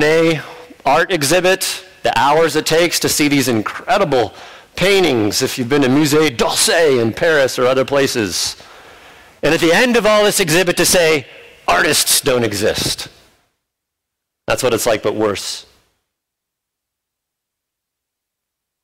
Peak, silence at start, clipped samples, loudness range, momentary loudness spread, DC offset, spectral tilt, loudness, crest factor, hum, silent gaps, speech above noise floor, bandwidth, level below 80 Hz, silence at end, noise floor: -4 dBFS; 0 s; under 0.1%; 8 LU; 9 LU; under 0.1%; -3 dB/octave; -14 LUFS; 12 dB; none; none; 66 dB; 16.5 kHz; -44 dBFS; 3.2 s; -80 dBFS